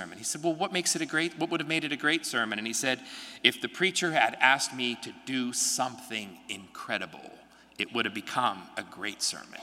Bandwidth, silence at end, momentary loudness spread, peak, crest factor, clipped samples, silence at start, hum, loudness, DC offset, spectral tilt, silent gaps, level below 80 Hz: 16 kHz; 0 s; 13 LU; -2 dBFS; 28 dB; under 0.1%; 0 s; none; -29 LUFS; under 0.1%; -2 dB/octave; none; -76 dBFS